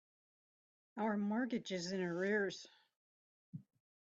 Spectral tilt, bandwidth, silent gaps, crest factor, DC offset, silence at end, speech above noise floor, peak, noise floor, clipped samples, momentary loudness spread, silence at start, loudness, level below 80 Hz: -5.5 dB/octave; 8 kHz; 2.96-3.53 s; 16 dB; under 0.1%; 0.45 s; over 51 dB; -26 dBFS; under -90 dBFS; under 0.1%; 19 LU; 0.95 s; -39 LUFS; -84 dBFS